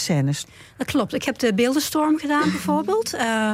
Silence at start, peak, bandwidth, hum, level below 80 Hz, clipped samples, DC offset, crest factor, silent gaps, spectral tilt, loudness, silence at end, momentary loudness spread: 0 s; -10 dBFS; 16.5 kHz; none; -58 dBFS; under 0.1%; under 0.1%; 12 dB; none; -5 dB/octave; -22 LUFS; 0 s; 5 LU